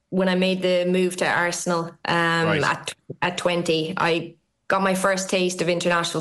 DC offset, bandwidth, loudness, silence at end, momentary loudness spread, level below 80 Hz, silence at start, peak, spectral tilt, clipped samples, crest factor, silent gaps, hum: under 0.1%; 13 kHz; -22 LUFS; 0 s; 6 LU; -62 dBFS; 0.1 s; -8 dBFS; -4.5 dB/octave; under 0.1%; 14 dB; none; none